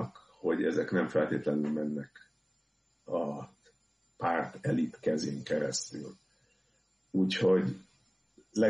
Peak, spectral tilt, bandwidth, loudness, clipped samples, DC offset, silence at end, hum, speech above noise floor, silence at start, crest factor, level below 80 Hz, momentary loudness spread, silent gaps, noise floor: -14 dBFS; -5.5 dB/octave; 10.5 kHz; -32 LUFS; under 0.1%; under 0.1%; 0 s; none; 42 dB; 0 s; 18 dB; -72 dBFS; 14 LU; none; -73 dBFS